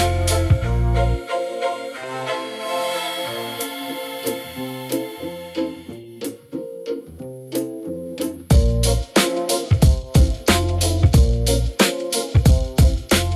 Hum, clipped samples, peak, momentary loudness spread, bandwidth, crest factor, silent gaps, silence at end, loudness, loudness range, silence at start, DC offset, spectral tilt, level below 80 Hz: none; under 0.1%; -2 dBFS; 14 LU; 15.5 kHz; 16 dB; none; 0 s; -21 LUFS; 11 LU; 0 s; under 0.1%; -5 dB/octave; -24 dBFS